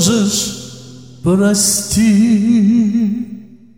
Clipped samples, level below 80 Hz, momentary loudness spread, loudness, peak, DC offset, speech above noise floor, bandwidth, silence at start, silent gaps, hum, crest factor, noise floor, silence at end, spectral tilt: under 0.1%; -44 dBFS; 12 LU; -13 LUFS; 0 dBFS; 0.4%; 23 dB; 16.5 kHz; 0 s; none; none; 14 dB; -35 dBFS; 0.35 s; -4.5 dB/octave